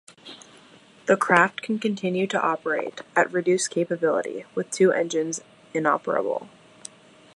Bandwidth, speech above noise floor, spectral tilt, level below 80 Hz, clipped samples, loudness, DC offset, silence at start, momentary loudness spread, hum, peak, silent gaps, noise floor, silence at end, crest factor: 11.5 kHz; 29 dB; -4.5 dB/octave; -76 dBFS; under 0.1%; -24 LUFS; under 0.1%; 0.25 s; 23 LU; none; -2 dBFS; none; -52 dBFS; 0.9 s; 22 dB